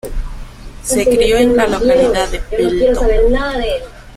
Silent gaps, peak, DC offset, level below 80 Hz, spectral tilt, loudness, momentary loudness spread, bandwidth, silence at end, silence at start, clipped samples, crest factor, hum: none; -2 dBFS; under 0.1%; -22 dBFS; -4.5 dB/octave; -14 LUFS; 15 LU; 15.5 kHz; 0 s; 0.05 s; under 0.1%; 12 dB; none